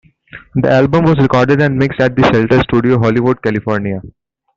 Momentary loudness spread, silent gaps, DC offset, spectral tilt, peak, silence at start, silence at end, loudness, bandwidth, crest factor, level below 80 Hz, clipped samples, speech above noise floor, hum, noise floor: 7 LU; none; under 0.1%; -8 dB/octave; -2 dBFS; 0.35 s; 0.45 s; -12 LUFS; 7.4 kHz; 10 dB; -40 dBFS; under 0.1%; 26 dB; none; -38 dBFS